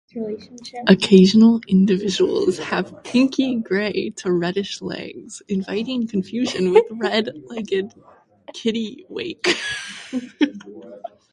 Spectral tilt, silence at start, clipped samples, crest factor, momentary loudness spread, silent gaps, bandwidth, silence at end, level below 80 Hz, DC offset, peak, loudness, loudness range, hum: -6 dB/octave; 0.15 s; under 0.1%; 20 dB; 18 LU; none; 11 kHz; 0.25 s; -60 dBFS; under 0.1%; 0 dBFS; -20 LUFS; 9 LU; none